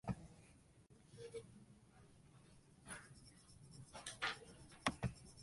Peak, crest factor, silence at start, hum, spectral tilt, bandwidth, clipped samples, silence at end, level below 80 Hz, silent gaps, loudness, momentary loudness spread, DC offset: -22 dBFS; 30 dB; 0.05 s; none; -4 dB/octave; 11.5 kHz; under 0.1%; 0 s; -66 dBFS; none; -49 LUFS; 22 LU; under 0.1%